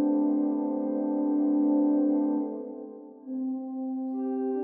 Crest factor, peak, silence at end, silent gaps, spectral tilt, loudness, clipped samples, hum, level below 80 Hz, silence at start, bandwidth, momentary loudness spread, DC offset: 12 dB; -16 dBFS; 0 s; none; -12 dB/octave; -28 LUFS; under 0.1%; none; -78 dBFS; 0 s; 1.7 kHz; 14 LU; under 0.1%